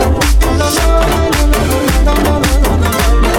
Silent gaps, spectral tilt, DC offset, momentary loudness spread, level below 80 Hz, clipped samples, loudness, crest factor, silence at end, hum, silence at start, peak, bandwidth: none; -5 dB/octave; under 0.1%; 1 LU; -12 dBFS; under 0.1%; -12 LUFS; 10 dB; 0 s; none; 0 s; 0 dBFS; 17.5 kHz